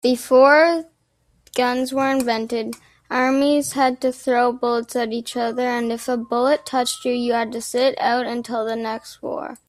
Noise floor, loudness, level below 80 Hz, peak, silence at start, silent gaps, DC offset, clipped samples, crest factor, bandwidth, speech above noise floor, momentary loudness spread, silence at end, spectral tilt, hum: -63 dBFS; -20 LUFS; -62 dBFS; -2 dBFS; 0.05 s; none; under 0.1%; under 0.1%; 18 dB; 15 kHz; 44 dB; 11 LU; 0.1 s; -3 dB/octave; none